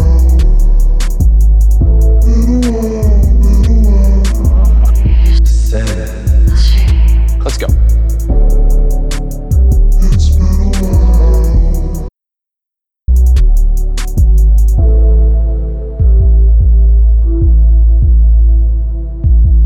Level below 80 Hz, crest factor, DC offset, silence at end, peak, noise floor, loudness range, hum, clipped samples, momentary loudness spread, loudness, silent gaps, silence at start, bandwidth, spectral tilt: -8 dBFS; 6 dB; under 0.1%; 0 s; -2 dBFS; -83 dBFS; 3 LU; none; under 0.1%; 6 LU; -11 LUFS; none; 0 s; 8.8 kHz; -7 dB/octave